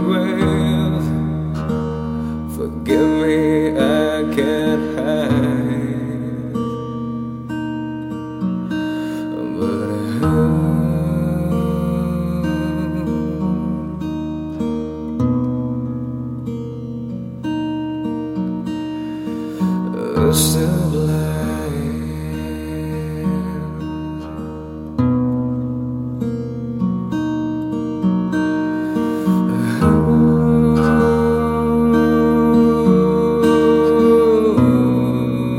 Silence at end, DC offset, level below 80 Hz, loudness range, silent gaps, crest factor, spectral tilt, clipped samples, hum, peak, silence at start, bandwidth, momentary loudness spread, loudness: 0 s; under 0.1%; -38 dBFS; 9 LU; none; 16 dB; -7 dB/octave; under 0.1%; none; 0 dBFS; 0 s; 16 kHz; 12 LU; -18 LUFS